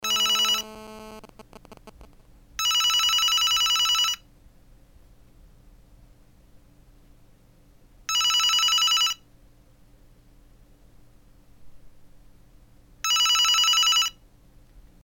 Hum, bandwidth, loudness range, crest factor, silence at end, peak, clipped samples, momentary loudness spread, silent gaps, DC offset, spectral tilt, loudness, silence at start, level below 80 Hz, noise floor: none; 18 kHz; 7 LU; 16 dB; 0.25 s; -12 dBFS; under 0.1%; 21 LU; none; under 0.1%; 2.5 dB/octave; -20 LUFS; 0 s; -54 dBFS; -55 dBFS